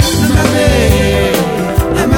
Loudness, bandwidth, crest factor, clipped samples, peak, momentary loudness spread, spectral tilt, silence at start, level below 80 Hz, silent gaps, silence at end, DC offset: -11 LUFS; 18 kHz; 10 dB; under 0.1%; 0 dBFS; 4 LU; -5 dB/octave; 0 s; -18 dBFS; none; 0 s; under 0.1%